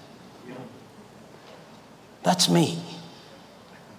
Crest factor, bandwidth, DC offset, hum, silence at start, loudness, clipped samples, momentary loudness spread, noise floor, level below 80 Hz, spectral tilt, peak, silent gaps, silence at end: 22 dB; 16 kHz; under 0.1%; none; 0.45 s; -23 LUFS; under 0.1%; 28 LU; -49 dBFS; -70 dBFS; -4 dB/octave; -8 dBFS; none; 0.9 s